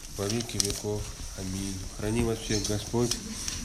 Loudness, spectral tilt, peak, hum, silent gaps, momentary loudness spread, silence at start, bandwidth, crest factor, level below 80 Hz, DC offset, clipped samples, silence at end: -31 LUFS; -4 dB/octave; 0 dBFS; none; none; 7 LU; 0 s; 16 kHz; 30 dB; -42 dBFS; under 0.1%; under 0.1%; 0 s